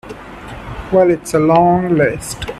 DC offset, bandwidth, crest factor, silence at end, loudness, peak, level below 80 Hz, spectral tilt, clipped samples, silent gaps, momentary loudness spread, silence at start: under 0.1%; 13.5 kHz; 14 dB; 0 s; -14 LUFS; 0 dBFS; -38 dBFS; -6 dB/octave; under 0.1%; none; 20 LU; 0.05 s